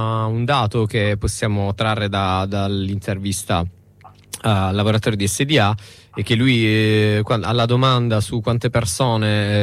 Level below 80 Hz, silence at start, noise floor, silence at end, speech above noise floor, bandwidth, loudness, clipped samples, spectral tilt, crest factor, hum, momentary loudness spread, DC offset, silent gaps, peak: -40 dBFS; 0 s; -46 dBFS; 0 s; 28 dB; 14.5 kHz; -19 LUFS; under 0.1%; -5.5 dB/octave; 14 dB; none; 7 LU; under 0.1%; none; -4 dBFS